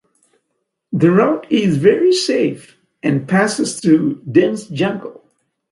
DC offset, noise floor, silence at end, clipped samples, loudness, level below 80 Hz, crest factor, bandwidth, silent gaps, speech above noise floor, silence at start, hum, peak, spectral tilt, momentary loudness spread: under 0.1%; -72 dBFS; 0.6 s; under 0.1%; -16 LUFS; -60 dBFS; 16 dB; 11.5 kHz; none; 58 dB; 0.9 s; none; 0 dBFS; -6 dB/octave; 10 LU